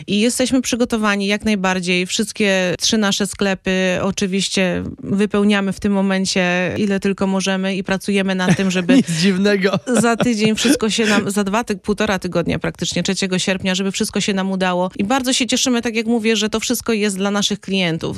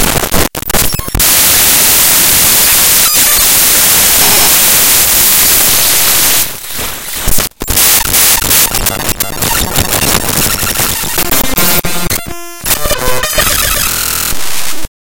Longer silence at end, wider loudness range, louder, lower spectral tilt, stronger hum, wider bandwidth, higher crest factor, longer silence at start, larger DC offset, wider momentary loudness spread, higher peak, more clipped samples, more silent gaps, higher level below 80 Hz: second, 0 s vs 0.3 s; second, 3 LU vs 7 LU; second, -17 LUFS vs -7 LUFS; first, -4 dB/octave vs -1 dB/octave; neither; second, 13.5 kHz vs over 20 kHz; first, 16 dB vs 10 dB; about the same, 0 s vs 0 s; neither; second, 4 LU vs 10 LU; about the same, -2 dBFS vs 0 dBFS; second, under 0.1% vs 1%; neither; second, -46 dBFS vs -24 dBFS